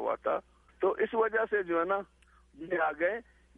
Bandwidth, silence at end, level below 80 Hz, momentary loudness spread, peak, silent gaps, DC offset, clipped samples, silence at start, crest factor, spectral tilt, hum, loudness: 3.8 kHz; 0.35 s; -64 dBFS; 9 LU; -16 dBFS; none; under 0.1%; under 0.1%; 0 s; 16 dB; -7 dB/octave; none; -31 LUFS